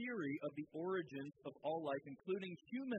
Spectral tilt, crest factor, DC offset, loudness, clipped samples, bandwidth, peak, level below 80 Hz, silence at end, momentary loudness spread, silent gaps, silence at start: -5 dB/octave; 14 dB; under 0.1%; -45 LUFS; under 0.1%; 8 kHz; -30 dBFS; under -90 dBFS; 0 s; 6 LU; none; 0 s